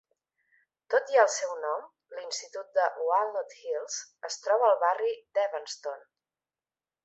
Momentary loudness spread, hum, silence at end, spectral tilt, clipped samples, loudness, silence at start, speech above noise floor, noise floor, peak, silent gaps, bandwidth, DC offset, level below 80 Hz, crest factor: 14 LU; none; 1.05 s; 2 dB/octave; under 0.1%; -29 LUFS; 0.9 s; over 61 dB; under -90 dBFS; -8 dBFS; none; 8.2 kHz; under 0.1%; -88 dBFS; 22 dB